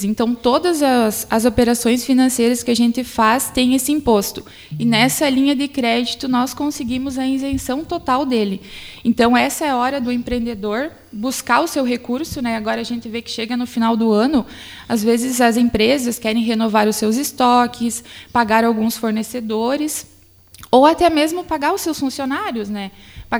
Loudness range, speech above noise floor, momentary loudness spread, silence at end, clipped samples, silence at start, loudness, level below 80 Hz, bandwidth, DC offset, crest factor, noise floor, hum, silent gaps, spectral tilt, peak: 4 LU; 29 dB; 9 LU; 0 s; under 0.1%; 0 s; -17 LUFS; -44 dBFS; over 20 kHz; under 0.1%; 18 dB; -46 dBFS; none; none; -4 dB/octave; 0 dBFS